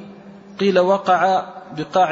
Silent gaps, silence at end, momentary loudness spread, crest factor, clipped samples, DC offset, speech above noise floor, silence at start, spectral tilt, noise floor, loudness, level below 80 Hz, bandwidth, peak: none; 0 s; 15 LU; 14 dB; under 0.1%; under 0.1%; 23 dB; 0 s; -6 dB/octave; -40 dBFS; -18 LUFS; -64 dBFS; 7.8 kHz; -4 dBFS